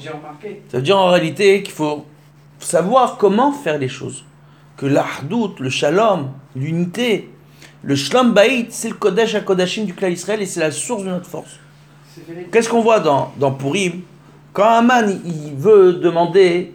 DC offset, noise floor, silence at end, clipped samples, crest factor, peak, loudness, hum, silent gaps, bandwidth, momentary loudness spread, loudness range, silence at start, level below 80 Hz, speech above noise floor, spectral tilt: under 0.1%; -45 dBFS; 0 s; under 0.1%; 16 dB; 0 dBFS; -16 LUFS; none; none; 16 kHz; 16 LU; 5 LU; 0 s; -64 dBFS; 29 dB; -5 dB/octave